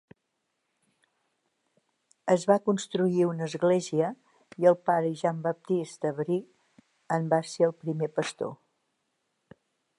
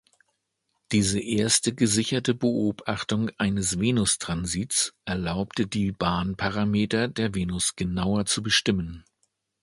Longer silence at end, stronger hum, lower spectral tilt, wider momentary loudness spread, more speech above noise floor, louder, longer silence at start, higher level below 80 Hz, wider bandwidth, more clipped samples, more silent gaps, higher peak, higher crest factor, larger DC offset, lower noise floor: first, 1.45 s vs 0.65 s; neither; first, -6.5 dB/octave vs -4 dB/octave; first, 9 LU vs 6 LU; about the same, 53 dB vs 52 dB; second, -28 LUFS vs -25 LUFS; first, 2.25 s vs 0.9 s; second, -80 dBFS vs -46 dBFS; about the same, 11.5 kHz vs 11.5 kHz; neither; neither; about the same, -8 dBFS vs -8 dBFS; about the same, 20 dB vs 18 dB; neither; about the same, -80 dBFS vs -77 dBFS